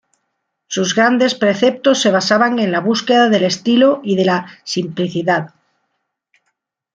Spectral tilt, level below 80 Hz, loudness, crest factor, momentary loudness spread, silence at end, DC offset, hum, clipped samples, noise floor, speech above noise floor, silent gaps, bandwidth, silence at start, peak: -4.5 dB/octave; -62 dBFS; -15 LUFS; 14 dB; 8 LU; 1.45 s; under 0.1%; none; under 0.1%; -72 dBFS; 58 dB; none; 9.4 kHz; 0.7 s; -2 dBFS